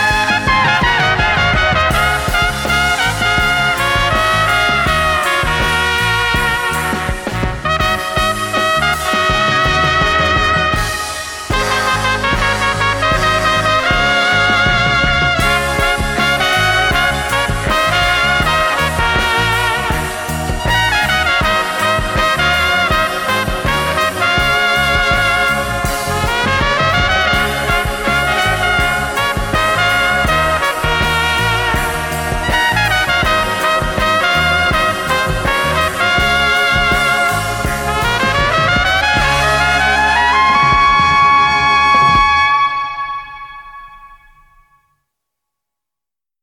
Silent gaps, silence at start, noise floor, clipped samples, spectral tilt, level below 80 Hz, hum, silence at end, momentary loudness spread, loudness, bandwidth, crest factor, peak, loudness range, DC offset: none; 0 s; -88 dBFS; under 0.1%; -3.5 dB/octave; -26 dBFS; none; 2.25 s; 5 LU; -13 LUFS; 19 kHz; 14 dB; 0 dBFS; 3 LU; under 0.1%